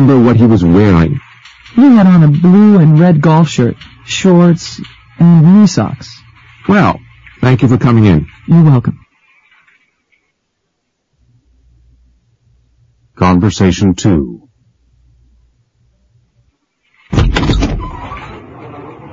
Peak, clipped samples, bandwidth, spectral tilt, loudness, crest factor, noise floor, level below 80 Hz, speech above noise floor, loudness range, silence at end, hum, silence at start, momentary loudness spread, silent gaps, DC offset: 0 dBFS; 0.1%; 7.6 kHz; -7.5 dB/octave; -9 LUFS; 10 dB; -67 dBFS; -28 dBFS; 60 dB; 11 LU; 0.05 s; none; 0 s; 21 LU; none; under 0.1%